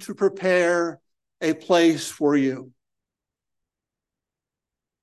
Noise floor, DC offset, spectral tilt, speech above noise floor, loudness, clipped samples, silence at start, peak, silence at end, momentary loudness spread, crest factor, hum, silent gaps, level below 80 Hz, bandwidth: -88 dBFS; under 0.1%; -4.5 dB/octave; 67 dB; -22 LUFS; under 0.1%; 0 s; -6 dBFS; 2.35 s; 9 LU; 18 dB; none; none; -76 dBFS; 12.5 kHz